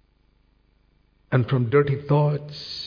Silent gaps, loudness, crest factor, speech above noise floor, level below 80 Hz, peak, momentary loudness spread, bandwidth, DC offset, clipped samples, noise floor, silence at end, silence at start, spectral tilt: none; -22 LUFS; 18 dB; 41 dB; -56 dBFS; -6 dBFS; 8 LU; 5.4 kHz; under 0.1%; under 0.1%; -62 dBFS; 0 s; 1.3 s; -8.5 dB/octave